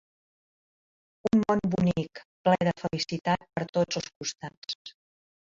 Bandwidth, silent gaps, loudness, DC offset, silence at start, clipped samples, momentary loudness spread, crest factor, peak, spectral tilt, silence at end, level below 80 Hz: 7.6 kHz; 2.25-2.45 s, 3.69-3.73 s, 4.16-4.21 s, 4.57-4.62 s, 4.75-4.85 s; -28 LUFS; under 0.1%; 1.25 s; under 0.1%; 13 LU; 20 dB; -10 dBFS; -5.5 dB/octave; 0.5 s; -60 dBFS